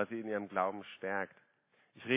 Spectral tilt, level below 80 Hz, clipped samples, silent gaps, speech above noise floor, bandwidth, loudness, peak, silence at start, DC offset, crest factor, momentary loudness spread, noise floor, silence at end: -3 dB/octave; -80 dBFS; under 0.1%; none; 30 dB; 4 kHz; -38 LUFS; -16 dBFS; 0 s; under 0.1%; 22 dB; 9 LU; -68 dBFS; 0 s